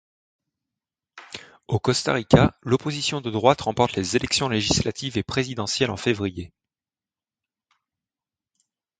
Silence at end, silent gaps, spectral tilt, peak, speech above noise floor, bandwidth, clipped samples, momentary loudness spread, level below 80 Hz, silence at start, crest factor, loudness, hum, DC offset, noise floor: 2.5 s; none; -4.5 dB/octave; 0 dBFS; over 68 dB; 9.6 kHz; under 0.1%; 17 LU; -46 dBFS; 1.15 s; 24 dB; -23 LUFS; none; under 0.1%; under -90 dBFS